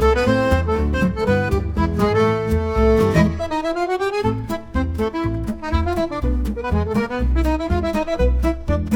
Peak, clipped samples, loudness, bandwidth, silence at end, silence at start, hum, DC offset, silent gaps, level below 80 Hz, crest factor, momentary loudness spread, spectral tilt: -2 dBFS; under 0.1%; -20 LUFS; 17.5 kHz; 0 s; 0 s; none; under 0.1%; none; -26 dBFS; 16 dB; 6 LU; -7.5 dB/octave